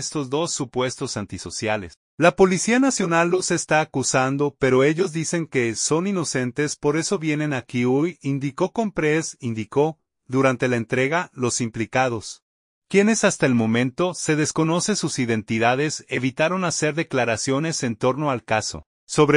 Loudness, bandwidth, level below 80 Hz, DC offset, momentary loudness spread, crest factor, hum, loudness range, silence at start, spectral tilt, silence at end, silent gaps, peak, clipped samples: -22 LUFS; 11 kHz; -56 dBFS; under 0.1%; 7 LU; 20 dB; none; 3 LU; 0 s; -4.5 dB/octave; 0 s; 1.97-2.18 s, 12.42-12.82 s, 18.86-19.07 s; -2 dBFS; under 0.1%